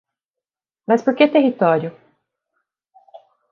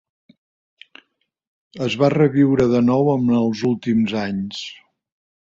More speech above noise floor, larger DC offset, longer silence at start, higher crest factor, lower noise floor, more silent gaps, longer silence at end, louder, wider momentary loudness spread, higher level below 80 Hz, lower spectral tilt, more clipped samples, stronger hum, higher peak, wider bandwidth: first, 72 dB vs 48 dB; neither; second, 0.9 s vs 1.75 s; about the same, 20 dB vs 18 dB; first, -88 dBFS vs -66 dBFS; neither; second, 0.35 s vs 0.7 s; about the same, -17 LUFS vs -18 LUFS; first, 14 LU vs 11 LU; second, -72 dBFS vs -54 dBFS; about the same, -7 dB/octave vs -7.5 dB/octave; neither; neither; about the same, 0 dBFS vs -2 dBFS; about the same, 7.2 kHz vs 7.6 kHz